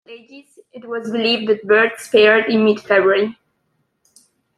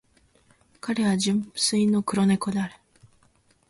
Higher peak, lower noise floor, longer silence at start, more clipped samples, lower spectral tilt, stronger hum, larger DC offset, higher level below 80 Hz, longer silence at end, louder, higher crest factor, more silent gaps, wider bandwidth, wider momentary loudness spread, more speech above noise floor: first, -2 dBFS vs -10 dBFS; first, -68 dBFS vs -63 dBFS; second, 0.1 s vs 0.85 s; neither; about the same, -4.5 dB/octave vs -4.5 dB/octave; neither; neither; about the same, -66 dBFS vs -62 dBFS; first, 1.25 s vs 0.95 s; first, -15 LUFS vs -24 LUFS; about the same, 16 dB vs 16 dB; neither; first, 13 kHz vs 11.5 kHz; first, 12 LU vs 8 LU; first, 52 dB vs 39 dB